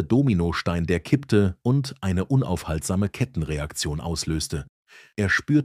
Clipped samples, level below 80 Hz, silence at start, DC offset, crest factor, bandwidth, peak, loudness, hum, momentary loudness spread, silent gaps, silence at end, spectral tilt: under 0.1%; -40 dBFS; 0 s; under 0.1%; 18 dB; 15 kHz; -6 dBFS; -24 LUFS; none; 8 LU; 4.69-4.86 s; 0 s; -6 dB/octave